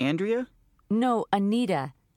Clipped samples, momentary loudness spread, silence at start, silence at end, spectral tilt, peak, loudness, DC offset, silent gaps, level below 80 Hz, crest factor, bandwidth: under 0.1%; 6 LU; 0 s; 0.25 s; -7 dB/octave; -10 dBFS; -27 LUFS; under 0.1%; none; -66 dBFS; 16 dB; 15 kHz